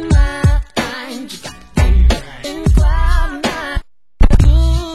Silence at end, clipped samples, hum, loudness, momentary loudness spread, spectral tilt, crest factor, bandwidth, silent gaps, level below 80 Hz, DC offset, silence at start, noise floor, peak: 0 s; 0.4%; none; -16 LUFS; 14 LU; -6 dB/octave; 12 dB; 12.5 kHz; none; -14 dBFS; 0.8%; 0 s; -32 dBFS; 0 dBFS